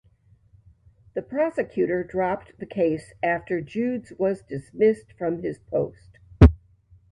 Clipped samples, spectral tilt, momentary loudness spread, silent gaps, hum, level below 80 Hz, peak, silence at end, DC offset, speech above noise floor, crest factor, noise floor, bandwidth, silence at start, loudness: under 0.1%; -9 dB/octave; 15 LU; none; none; -32 dBFS; 0 dBFS; 0.55 s; under 0.1%; 33 dB; 24 dB; -59 dBFS; 10 kHz; 1.15 s; -24 LUFS